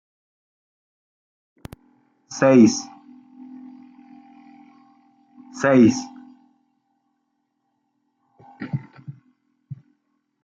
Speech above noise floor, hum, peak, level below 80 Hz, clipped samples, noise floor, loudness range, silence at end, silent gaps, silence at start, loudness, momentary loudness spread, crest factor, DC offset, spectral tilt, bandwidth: 58 dB; none; -4 dBFS; -66 dBFS; under 0.1%; -73 dBFS; 17 LU; 0.7 s; none; 2.3 s; -18 LUFS; 28 LU; 22 dB; under 0.1%; -6 dB/octave; 7.8 kHz